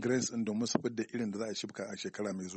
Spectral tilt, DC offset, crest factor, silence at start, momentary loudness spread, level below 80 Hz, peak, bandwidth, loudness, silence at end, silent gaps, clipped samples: -4 dB/octave; under 0.1%; 22 dB; 0 s; 8 LU; -76 dBFS; -12 dBFS; 8.4 kHz; -36 LUFS; 0 s; none; under 0.1%